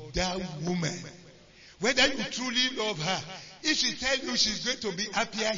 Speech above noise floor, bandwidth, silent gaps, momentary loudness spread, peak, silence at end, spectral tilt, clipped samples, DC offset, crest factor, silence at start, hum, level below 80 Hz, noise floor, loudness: 24 dB; 7.6 kHz; none; 9 LU; -12 dBFS; 0 s; -2.5 dB/octave; under 0.1%; under 0.1%; 18 dB; 0 s; none; -52 dBFS; -54 dBFS; -28 LUFS